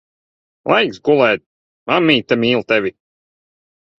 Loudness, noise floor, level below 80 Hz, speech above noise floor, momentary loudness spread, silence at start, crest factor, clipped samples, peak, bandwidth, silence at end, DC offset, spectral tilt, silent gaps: -15 LUFS; under -90 dBFS; -58 dBFS; over 75 dB; 11 LU; 0.65 s; 18 dB; under 0.1%; 0 dBFS; 7.2 kHz; 1.1 s; under 0.1%; -6 dB/octave; 1.46-1.86 s